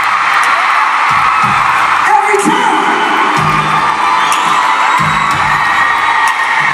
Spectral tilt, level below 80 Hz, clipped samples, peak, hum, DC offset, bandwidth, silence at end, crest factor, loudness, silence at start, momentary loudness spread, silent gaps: -3 dB/octave; -44 dBFS; under 0.1%; 0 dBFS; none; under 0.1%; 16 kHz; 0 s; 10 dB; -9 LUFS; 0 s; 2 LU; none